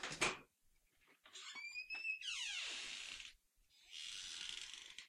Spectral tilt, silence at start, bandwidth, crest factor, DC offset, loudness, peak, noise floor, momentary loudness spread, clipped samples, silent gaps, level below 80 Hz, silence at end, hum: 0 dB/octave; 0 s; 16 kHz; 28 dB; under 0.1%; -45 LUFS; -22 dBFS; -77 dBFS; 14 LU; under 0.1%; none; -76 dBFS; 0 s; none